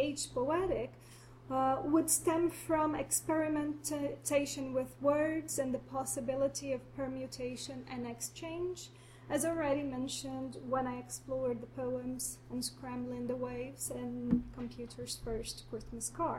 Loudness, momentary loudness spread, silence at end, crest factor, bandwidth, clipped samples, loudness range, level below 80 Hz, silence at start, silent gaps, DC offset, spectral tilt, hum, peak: -36 LUFS; 11 LU; 0 s; 20 dB; 16 kHz; under 0.1%; 6 LU; -58 dBFS; 0 s; none; under 0.1%; -4 dB/octave; none; -16 dBFS